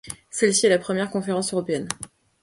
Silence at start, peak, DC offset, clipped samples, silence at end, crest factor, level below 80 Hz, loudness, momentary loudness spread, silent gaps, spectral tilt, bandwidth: 0.05 s; -4 dBFS; under 0.1%; under 0.1%; 0.35 s; 20 dB; -60 dBFS; -23 LUFS; 13 LU; none; -3.5 dB/octave; 11.5 kHz